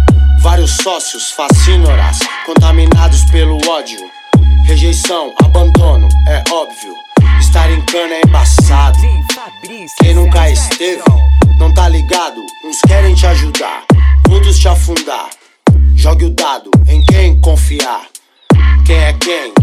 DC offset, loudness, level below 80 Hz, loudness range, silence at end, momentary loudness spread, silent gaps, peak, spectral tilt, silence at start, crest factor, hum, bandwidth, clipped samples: under 0.1%; -9 LUFS; -10 dBFS; 1 LU; 0 s; 8 LU; none; 0 dBFS; -5.5 dB/octave; 0 s; 8 dB; none; 13.5 kHz; under 0.1%